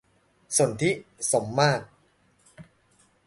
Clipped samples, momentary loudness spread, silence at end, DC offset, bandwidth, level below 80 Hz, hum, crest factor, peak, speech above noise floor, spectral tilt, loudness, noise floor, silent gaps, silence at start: under 0.1%; 6 LU; 0.65 s; under 0.1%; 12 kHz; -64 dBFS; none; 22 dB; -8 dBFS; 39 dB; -4 dB/octave; -25 LUFS; -64 dBFS; none; 0.5 s